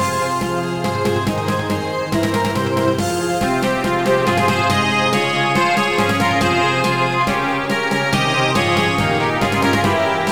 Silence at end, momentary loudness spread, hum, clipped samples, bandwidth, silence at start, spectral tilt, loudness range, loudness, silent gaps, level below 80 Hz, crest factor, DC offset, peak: 0 s; 4 LU; none; under 0.1%; over 20 kHz; 0 s; -5 dB/octave; 3 LU; -17 LUFS; none; -44 dBFS; 14 dB; 0.6%; -2 dBFS